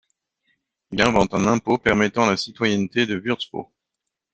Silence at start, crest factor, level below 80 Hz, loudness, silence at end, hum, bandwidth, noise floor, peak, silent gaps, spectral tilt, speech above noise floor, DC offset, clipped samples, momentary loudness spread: 0.9 s; 22 dB; -50 dBFS; -21 LUFS; 0.7 s; none; 8.6 kHz; -83 dBFS; 0 dBFS; none; -5 dB/octave; 62 dB; under 0.1%; under 0.1%; 9 LU